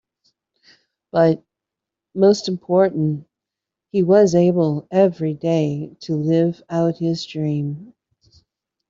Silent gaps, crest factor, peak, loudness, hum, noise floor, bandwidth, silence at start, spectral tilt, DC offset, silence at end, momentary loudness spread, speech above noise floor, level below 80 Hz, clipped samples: none; 16 dB; -4 dBFS; -19 LUFS; none; -85 dBFS; 7.6 kHz; 1.15 s; -7.5 dB/octave; under 0.1%; 1.05 s; 11 LU; 67 dB; -62 dBFS; under 0.1%